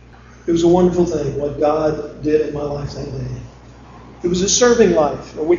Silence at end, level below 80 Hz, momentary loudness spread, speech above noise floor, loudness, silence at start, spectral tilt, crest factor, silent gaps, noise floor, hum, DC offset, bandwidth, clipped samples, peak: 0 s; -38 dBFS; 14 LU; 23 dB; -17 LUFS; 0.45 s; -5 dB/octave; 18 dB; none; -40 dBFS; none; under 0.1%; 7.6 kHz; under 0.1%; 0 dBFS